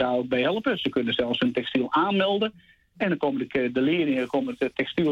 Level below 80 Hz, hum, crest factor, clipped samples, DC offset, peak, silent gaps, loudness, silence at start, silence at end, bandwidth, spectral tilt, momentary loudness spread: -60 dBFS; none; 12 dB; under 0.1%; under 0.1%; -12 dBFS; none; -25 LUFS; 0 s; 0 s; 7.8 kHz; -7 dB/octave; 5 LU